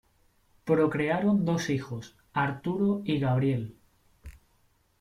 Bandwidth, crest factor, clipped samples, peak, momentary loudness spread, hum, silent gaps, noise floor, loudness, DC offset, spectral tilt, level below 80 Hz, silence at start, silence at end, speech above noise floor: 12.5 kHz; 18 dB; under 0.1%; -12 dBFS; 13 LU; none; none; -67 dBFS; -28 LUFS; under 0.1%; -7 dB/octave; -58 dBFS; 0.65 s; 0.65 s; 40 dB